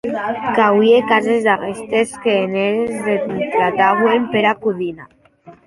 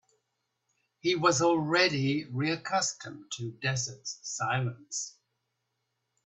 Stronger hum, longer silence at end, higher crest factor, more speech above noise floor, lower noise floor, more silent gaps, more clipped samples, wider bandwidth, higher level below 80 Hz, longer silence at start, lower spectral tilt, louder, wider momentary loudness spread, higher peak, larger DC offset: neither; second, 0.15 s vs 1.15 s; second, 14 dB vs 22 dB; second, 28 dB vs 52 dB; second, -44 dBFS vs -81 dBFS; neither; neither; first, 11.5 kHz vs 8.4 kHz; first, -58 dBFS vs -70 dBFS; second, 0.05 s vs 1.05 s; first, -5.5 dB/octave vs -4 dB/octave; first, -16 LUFS vs -29 LUFS; second, 8 LU vs 14 LU; first, -2 dBFS vs -10 dBFS; neither